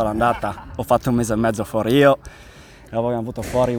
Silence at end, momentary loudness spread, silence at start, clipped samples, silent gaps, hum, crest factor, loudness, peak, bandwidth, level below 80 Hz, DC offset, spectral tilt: 0 s; 11 LU; 0 s; under 0.1%; none; none; 18 dB; -20 LUFS; -2 dBFS; over 20 kHz; -40 dBFS; under 0.1%; -6 dB/octave